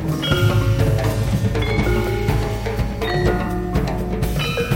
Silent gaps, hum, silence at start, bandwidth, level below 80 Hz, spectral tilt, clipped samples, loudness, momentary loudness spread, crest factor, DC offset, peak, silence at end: none; none; 0 s; 17 kHz; -26 dBFS; -6.5 dB/octave; under 0.1%; -20 LUFS; 5 LU; 14 dB; under 0.1%; -4 dBFS; 0 s